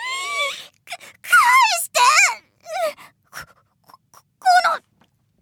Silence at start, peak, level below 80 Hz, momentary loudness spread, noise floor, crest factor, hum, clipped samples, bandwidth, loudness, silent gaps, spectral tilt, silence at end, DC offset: 0 s; -2 dBFS; -72 dBFS; 23 LU; -62 dBFS; 18 dB; none; under 0.1%; 19.5 kHz; -16 LUFS; none; 2.5 dB/octave; 0.65 s; under 0.1%